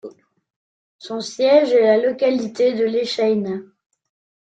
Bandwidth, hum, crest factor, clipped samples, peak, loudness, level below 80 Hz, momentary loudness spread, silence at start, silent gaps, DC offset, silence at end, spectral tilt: 9 kHz; none; 18 dB; under 0.1%; -2 dBFS; -18 LUFS; -68 dBFS; 14 LU; 0.05 s; 0.56-0.99 s; under 0.1%; 0.85 s; -5 dB/octave